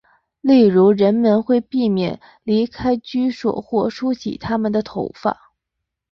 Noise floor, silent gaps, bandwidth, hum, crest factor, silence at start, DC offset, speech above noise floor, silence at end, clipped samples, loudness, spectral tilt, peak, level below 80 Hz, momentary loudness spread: -80 dBFS; none; 6.6 kHz; none; 14 dB; 0.45 s; under 0.1%; 63 dB; 0.8 s; under 0.1%; -18 LUFS; -8 dB/octave; -4 dBFS; -52 dBFS; 11 LU